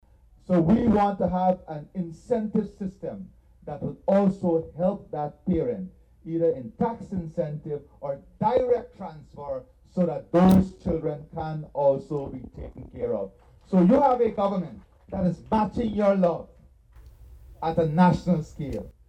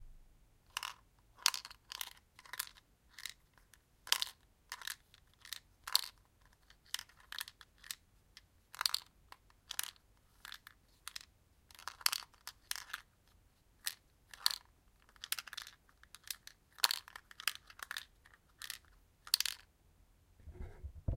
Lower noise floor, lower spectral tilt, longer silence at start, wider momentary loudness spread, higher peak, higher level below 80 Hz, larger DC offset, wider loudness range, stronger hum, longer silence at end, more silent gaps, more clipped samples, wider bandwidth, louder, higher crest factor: second, -52 dBFS vs -69 dBFS; first, -9 dB/octave vs 0.5 dB/octave; first, 0.5 s vs 0 s; second, 17 LU vs 24 LU; about the same, -6 dBFS vs -6 dBFS; first, -48 dBFS vs -60 dBFS; neither; about the same, 4 LU vs 4 LU; neither; first, 0.2 s vs 0 s; neither; neither; second, 9.2 kHz vs 16.5 kHz; first, -25 LUFS vs -40 LUFS; second, 18 dB vs 38 dB